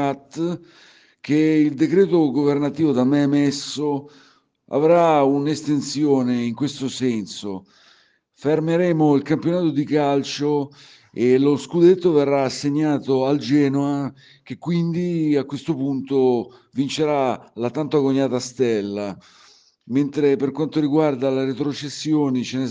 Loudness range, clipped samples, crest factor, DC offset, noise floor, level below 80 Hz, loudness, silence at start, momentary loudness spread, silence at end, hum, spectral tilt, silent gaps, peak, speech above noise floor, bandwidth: 4 LU; under 0.1%; 16 dB; under 0.1%; -58 dBFS; -66 dBFS; -20 LUFS; 0 s; 10 LU; 0 s; none; -6.5 dB/octave; none; -4 dBFS; 38 dB; 9.6 kHz